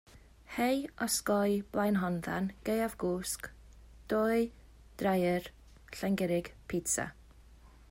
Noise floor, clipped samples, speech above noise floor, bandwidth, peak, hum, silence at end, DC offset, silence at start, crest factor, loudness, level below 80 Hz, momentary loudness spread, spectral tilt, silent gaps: -57 dBFS; under 0.1%; 24 dB; 16 kHz; -18 dBFS; none; 0.2 s; under 0.1%; 0.15 s; 16 dB; -33 LUFS; -56 dBFS; 9 LU; -4.5 dB/octave; none